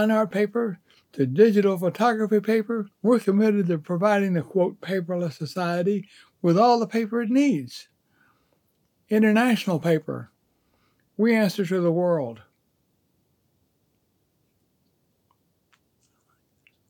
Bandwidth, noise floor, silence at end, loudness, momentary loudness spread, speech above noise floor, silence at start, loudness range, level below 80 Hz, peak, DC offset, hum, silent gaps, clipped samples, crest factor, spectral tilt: 18 kHz; -70 dBFS; 4.55 s; -23 LUFS; 11 LU; 48 dB; 0 s; 4 LU; -82 dBFS; -6 dBFS; under 0.1%; none; none; under 0.1%; 20 dB; -7 dB/octave